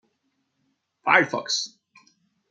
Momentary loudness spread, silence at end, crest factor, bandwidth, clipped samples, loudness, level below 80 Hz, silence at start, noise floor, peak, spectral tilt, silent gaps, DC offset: 12 LU; 0.85 s; 26 dB; 9.6 kHz; under 0.1%; -22 LUFS; -82 dBFS; 1.05 s; -74 dBFS; -2 dBFS; -2 dB/octave; none; under 0.1%